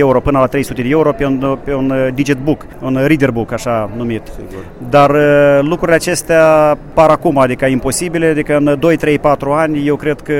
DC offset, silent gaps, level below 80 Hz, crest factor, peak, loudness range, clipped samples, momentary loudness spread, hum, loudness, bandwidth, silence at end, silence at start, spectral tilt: under 0.1%; none; -34 dBFS; 12 dB; 0 dBFS; 5 LU; under 0.1%; 9 LU; none; -12 LUFS; 16.5 kHz; 0 s; 0 s; -6 dB/octave